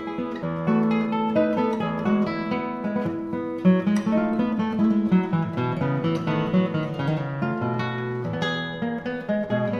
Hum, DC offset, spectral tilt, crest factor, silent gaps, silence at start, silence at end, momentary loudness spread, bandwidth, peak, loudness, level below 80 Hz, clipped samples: none; under 0.1%; -8 dB/octave; 16 dB; none; 0 s; 0 s; 7 LU; 7 kHz; -8 dBFS; -24 LUFS; -58 dBFS; under 0.1%